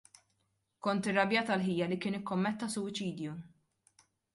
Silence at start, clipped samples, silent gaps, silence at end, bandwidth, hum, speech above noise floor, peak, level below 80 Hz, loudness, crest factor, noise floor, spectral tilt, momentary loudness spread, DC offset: 0.85 s; under 0.1%; none; 0.85 s; 11.5 kHz; none; 46 dB; -16 dBFS; -74 dBFS; -34 LUFS; 20 dB; -79 dBFS; -5 dB/octave; 10 LU; under 0.1%